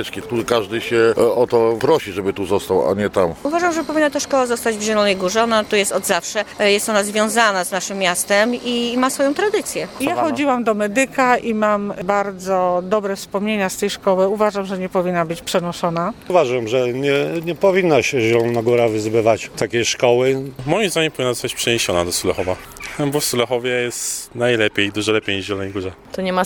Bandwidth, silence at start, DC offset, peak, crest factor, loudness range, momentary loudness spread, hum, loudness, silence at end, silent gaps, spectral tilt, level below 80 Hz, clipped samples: 19 kHz; 0 s; under 0.1%; 0 dBFS; 18 dB; 3 LU; 7 LU; none; -18 LUFS; 0 s; none; -4 dB/octave; -50 dBFS; under 0.1%